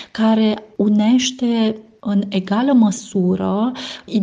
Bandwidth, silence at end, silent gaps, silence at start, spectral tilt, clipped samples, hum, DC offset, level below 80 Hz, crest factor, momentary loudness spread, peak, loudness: 9.4 kHz; 0 s; none; 0 s; -5.5 dB/octave; under 0.1%; none; under 0.1%; -58 dBFS; 14 dB; 7 LU; -4 dBFS; -17 LUFS